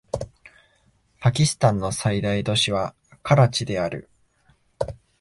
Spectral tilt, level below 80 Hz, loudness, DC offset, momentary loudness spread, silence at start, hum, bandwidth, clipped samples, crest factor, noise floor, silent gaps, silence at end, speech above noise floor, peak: -5 dB/octave; -48 dBFS; -22 LUFS; under 0.1%; 14 LU; 0.15 s; none; 11.5 kHz; under 0.1%; 18 dB; -63 dBFS; none; 0.25 s; 41 dB; -6 dBFS